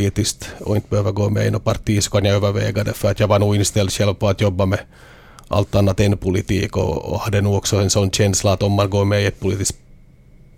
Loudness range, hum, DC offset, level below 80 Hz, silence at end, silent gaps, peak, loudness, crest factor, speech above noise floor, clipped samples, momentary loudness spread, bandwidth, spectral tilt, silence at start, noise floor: 2 LU; none; under 0.1%; -38 dBFS; 0.85 s; none; -2 dBFS; -18 LUFS; 16 dB; 28 dB; under 0.1%; 6 LU; 15.5 kHz; -5 dB/octave; 0 s; -46 dBFS